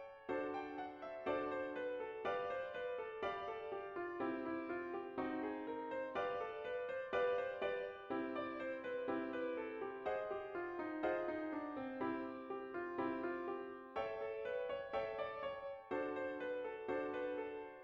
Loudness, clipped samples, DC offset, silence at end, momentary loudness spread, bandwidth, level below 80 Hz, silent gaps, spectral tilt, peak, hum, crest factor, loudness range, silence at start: -44 LUFS; under 0.1%; under 0.1%; 0 s; 5 LU; 7 kHz; -76 dBFS; none; -6.5 dB/octave; -26 dBFS; none; 16 dB; 2 LU; 0 s